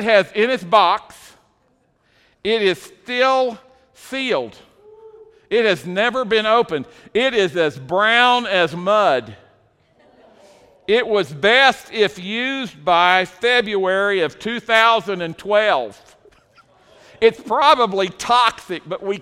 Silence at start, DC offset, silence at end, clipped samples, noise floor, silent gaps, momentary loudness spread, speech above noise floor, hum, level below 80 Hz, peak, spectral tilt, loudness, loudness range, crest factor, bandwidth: 0 s; under 0.1%; 0 s; under 0.1%; -62 dBFS; none; 11 LU; 44 dB; none; -58 dBFS; 0 dBFS; -4 dB/octave; -17 LUFS; 5 LU; 18 dB; 15 kHz